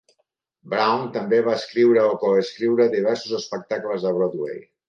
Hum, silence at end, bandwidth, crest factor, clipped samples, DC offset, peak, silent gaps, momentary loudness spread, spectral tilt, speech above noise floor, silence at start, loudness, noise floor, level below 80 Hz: none; 0.3 s; 7.4 kHz; 16 dB; under 0.1%; under 0.1%; -6 dBFS; none; 10 LU; -5.5 dB/octave; 52 dB; 0.65 s; -21 LUFS; -72 dBFS; -74 dBFS